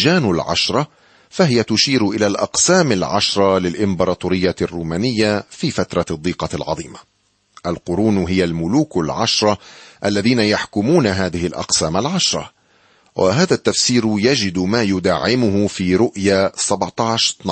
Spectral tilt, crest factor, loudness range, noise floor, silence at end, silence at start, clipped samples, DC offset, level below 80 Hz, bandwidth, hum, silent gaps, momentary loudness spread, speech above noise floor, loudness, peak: -4 dB/octave; 16 dB; 5 LU; -55 dBFS; 0 s; 0 s; under 0.1%; under 0.1%; -46 dBFS; 8.8 kHz; none; none; 8 LU; 38 dB; -17 LUFS; -2 dBFS